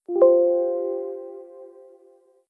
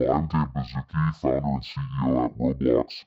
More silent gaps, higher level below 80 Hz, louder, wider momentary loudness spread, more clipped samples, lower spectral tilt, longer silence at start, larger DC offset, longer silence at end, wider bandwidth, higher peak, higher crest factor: neither; second, -90 dBFS vs -42 dBFS; first, -20 LUFS vs -26 LUFS; first, 22 LU vs 7 LU; neither; about the same, -9.5 dB/octave vs -9.5 dB/octave; about the same, 0.1 s vs 0 s; neither; first, 0.85 s vs 0.05 s; second, 1.7 kHz vs 7.2 kHz; first, -4 dBFS vs -8 dBFS; about the same, 18 dB vs 16 dB